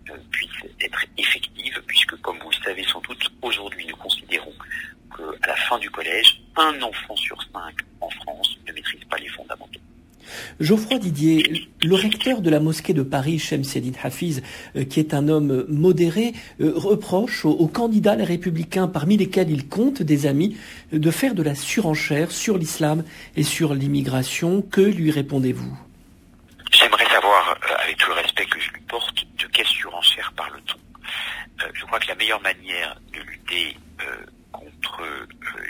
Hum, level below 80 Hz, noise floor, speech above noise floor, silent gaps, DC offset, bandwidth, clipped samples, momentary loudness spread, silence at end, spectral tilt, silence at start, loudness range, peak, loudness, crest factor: none; -52 dBFS; -50 dBFS; 29 dB; none; under 0.1%; 16 kHz; under 0.1%; 14 LU; 0 s; -4.5 dB/octave; 0.05 s; 8 LU; 0 dBFS; -21 LUFS; 22 dB